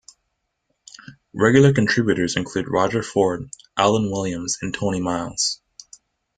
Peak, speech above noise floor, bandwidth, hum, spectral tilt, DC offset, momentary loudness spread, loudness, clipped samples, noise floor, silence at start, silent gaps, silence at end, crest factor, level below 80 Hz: -2 dBFS; 55 dB; 9.6 kHz; none; -5 dB/octave; under 0.1%; 10 LU; -20 LUFS; under 0.1%; -75 dBFS; 1.1 s; none; 0.8 s; 20 dB; -52 dBFS